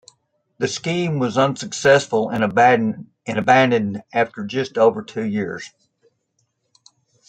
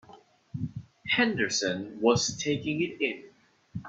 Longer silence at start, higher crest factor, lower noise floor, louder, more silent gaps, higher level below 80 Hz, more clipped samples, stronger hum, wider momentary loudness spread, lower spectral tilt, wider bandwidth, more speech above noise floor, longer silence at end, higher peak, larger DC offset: first, 0.6 s vs 0.1 s; about the same, 18 dB vs 20 dB; first, -70 dBFS vs -55 dBFS; first, -19 LUFS vs -28 LUFS; neither; about the same, -62 dBFS vs -64 dBFS; neither; neither; second, 12 LU vs 16 LU; first, -5 dB/octave vs -3.5 dB/octave; first, 9.2 kHz vs 8.2 kHz; first, 51 dB vs 27 dB; first, 1.6 s vs 0 s; first, -2 dBFS vs -10 dBFS; neither